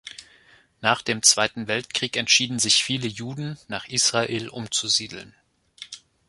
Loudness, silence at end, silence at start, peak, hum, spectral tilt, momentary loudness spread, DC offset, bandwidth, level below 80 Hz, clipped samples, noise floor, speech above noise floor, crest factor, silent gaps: -21 LUFS; 0.3 s; 0.05 s; -2 dBFS; none; -1.5 dB/octave; 22 LU; under 0.1%; 12 kHz; -62 dBFS; under 0.1%; -56 dBFS; 32 dB; 22 dB; none